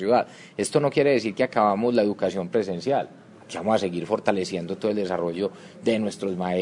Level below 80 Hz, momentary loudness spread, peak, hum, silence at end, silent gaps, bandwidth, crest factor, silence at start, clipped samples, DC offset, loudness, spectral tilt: -68 dBFS; 9 LU; -4 dBFS; none; 0 s; none; 11 kHz; 20 dB; 0 s; under 0.1%; under 0.1%; -25 LUFS; -5.5 dB/octave